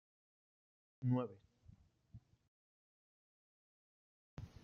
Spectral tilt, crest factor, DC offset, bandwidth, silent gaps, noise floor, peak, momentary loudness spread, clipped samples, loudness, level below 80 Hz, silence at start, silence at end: -10 dB/octave; 22 dB; under 0.1%; 6.4 kHz; 2.48-4.37 s; -67 dBFS; -26 dBFS; 25 LU; under 0.1%; -41 LUFS; -72 dBFS; 1 s; 0.15 s